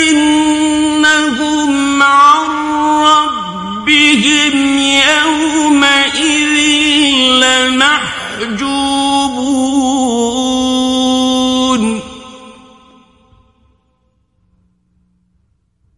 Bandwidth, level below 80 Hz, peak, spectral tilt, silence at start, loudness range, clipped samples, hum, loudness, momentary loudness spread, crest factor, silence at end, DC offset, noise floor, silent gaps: 11.5 kHz; -44 dBFS; 0 dBFS; -2 dB/octave; 0 s; 7 LU; under 0.1%; none; -10 LUFS; 8 LU; 12 dB; 3.45 s; under 0.1%; -59 dBFS; none